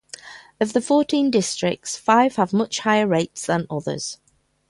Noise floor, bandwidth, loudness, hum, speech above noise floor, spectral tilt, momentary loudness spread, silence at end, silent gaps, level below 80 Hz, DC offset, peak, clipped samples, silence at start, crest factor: -41 dBFS; 11.5 kHz; -21 LUFS; none; 21 dB; -4.5 dB/octave; 12 LU; 0.55 s; none; -62 dBFS; under 0.1%; -4 dBFS; under 0.1%; 0.25 s; 18 dB